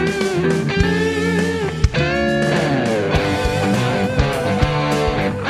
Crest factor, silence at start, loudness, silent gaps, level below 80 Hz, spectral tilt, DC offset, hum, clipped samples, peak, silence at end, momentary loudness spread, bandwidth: 18 dB; 0 s; -18 LUFS; none; -30 dBFS; -6 dB/octave; under 0.1%; none; under 0.1%; 0 dBFS; 0 s; 2 LU; 15 kHz